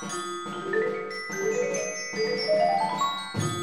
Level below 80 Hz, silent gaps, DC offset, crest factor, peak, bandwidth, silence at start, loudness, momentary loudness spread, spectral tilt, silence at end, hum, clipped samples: -66 dBFS; none; 0.2%; 14 dB; -14 dBFS; 13 kHz; 0 s; -28 LUFS; 9 LU; -3.5 dB/octave; 0 s; none; under 0.1%